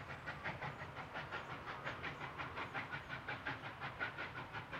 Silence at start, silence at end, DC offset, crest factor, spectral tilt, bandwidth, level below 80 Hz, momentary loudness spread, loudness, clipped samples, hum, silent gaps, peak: 0 s; 0 s; under 0.1%; 20 dB; -5 dB/octave; 16 kHz; -68 dBFS; 4 LU; -46 LUFS; under 0.1%; none; none; -28 dBFS